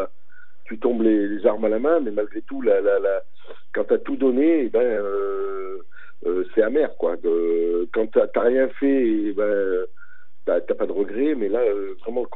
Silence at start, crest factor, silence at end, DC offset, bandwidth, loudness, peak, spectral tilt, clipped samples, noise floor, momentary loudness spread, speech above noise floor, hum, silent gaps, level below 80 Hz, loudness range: 0 s; 18 dB; 0 s; 4%; 4 kHz; -22 LUFS; -4 dBFS; -9.5 dB/octave; under 0.1%; -54 dBFS; 9 LU; 33 dB; none; none; -84 dBFS; 2 LU